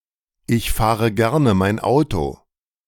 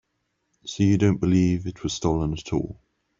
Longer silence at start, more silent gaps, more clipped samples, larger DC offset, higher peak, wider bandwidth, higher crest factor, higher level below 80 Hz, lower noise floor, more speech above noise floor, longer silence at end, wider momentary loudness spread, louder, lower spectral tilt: second, 0.5 s vs 0.65 s; neither; neither; neither; about the same, -4 dBFS vs -6 dBFS; first, 18 kHz vs 7.8 kHz; about the same, 16 dB vs 18 dB; first, -34 dBFS vs -44 dBFS; second, -39 dBFS vs -75 dBFS; second, 21 dB vs 52 dB; about the same, 0.55 s vs 0.45 s; second, 8 LU vs 14 LU; first, -19 LUFS vs -23 LUFS; about the same, -6.5 dB/octave vs -6.5 dB/octave